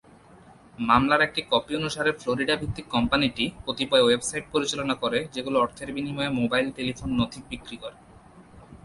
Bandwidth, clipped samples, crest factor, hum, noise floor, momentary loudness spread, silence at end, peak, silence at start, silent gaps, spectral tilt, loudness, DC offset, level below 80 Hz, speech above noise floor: 11.5 kHz; under 0.1%; 20 dB; none; -51 dBFS; 11 LU; 0.1 s; -6 dBFS; 0.8 s; none; -4 dB/octave; -25 LUFS; under 0.1%; -48 dBFS; 26 dB